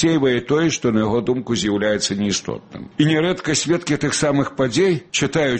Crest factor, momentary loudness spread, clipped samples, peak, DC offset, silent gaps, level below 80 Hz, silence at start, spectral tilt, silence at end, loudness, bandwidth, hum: 14 dB; 4 LU; under 0.1%; -4 dBFS; under 0.1%; none; -50 dBFS; 0 s; -4.5 dB/octave; 0 s; -19 LUFS; 8.8 kHz; none